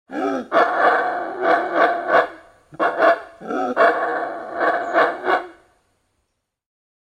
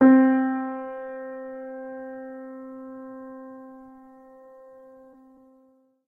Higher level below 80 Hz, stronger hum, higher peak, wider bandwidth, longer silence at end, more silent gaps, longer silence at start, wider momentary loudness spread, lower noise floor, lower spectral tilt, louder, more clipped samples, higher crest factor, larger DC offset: about the same, -68 dBFS vs -72 dBFS; neither; first, -2 dBFS vs -6 dBFS; first, 9.4 kHz vs 3.1 kHz; second, 1.5 s vs 2.35 s; neither; about the same, 0.1 s vs 0 s; second, 9 LU vs 27 LU; first, -73 dBFS vs -61 dBFS; second, -4.5 dB/octave vs -9.5 dB/octave; first, -19 LUFS vs -26 LUFS; neither; about the same, 18 dB vs 20 dB; neither